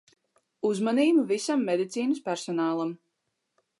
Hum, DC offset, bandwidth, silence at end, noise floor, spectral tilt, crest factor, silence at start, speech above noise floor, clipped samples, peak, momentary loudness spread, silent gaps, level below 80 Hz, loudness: none; under 0.1%; 11.5 kHz; 0.85 s; -80 dBFS; -5 dB/octave; 16 dB; 0.65 s; 54 dB; under 0.1%; -12 dBFS; 9 LU; none; -84 dBFS; -27 LUFS